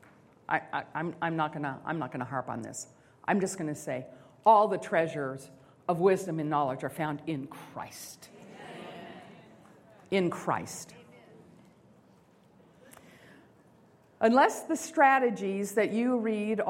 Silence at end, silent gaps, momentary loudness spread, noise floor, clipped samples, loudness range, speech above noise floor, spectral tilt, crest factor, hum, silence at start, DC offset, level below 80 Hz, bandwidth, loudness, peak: 0 s; none; 22 LU; -61 dBFS; under 0.1%; 10 LU; 32 dB; -5.5 dB/octave; 22 dB; none; 0.5 s; under 0.1%; -74 dBFS; 16 kHz; -29 LUFS; -10 dBFS